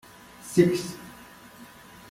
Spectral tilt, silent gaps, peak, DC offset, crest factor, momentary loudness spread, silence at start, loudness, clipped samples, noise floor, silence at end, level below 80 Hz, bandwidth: -6 dB/octave; none; -6 dBFS; under 0.1%; 22 dB; 25 LU; 0.4 s; -25 LUFS; under 0.1%; -48 dBFS; 0.45 s; -62 dBFS; 16 kHz